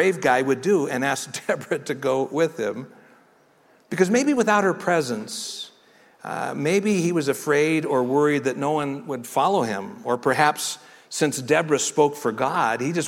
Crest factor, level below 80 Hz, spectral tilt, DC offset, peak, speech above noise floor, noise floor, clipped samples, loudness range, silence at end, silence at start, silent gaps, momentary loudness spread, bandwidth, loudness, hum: 20 dB; -68 dBFS; -4.5 dB/octave; under 0.1%; -4 dBFS; 35 dB; -57 dBFS; under 0.1%; 3 LU; 0 s; 0 s; none; 10 LU; 16.5 kHz; -22 LUFS; none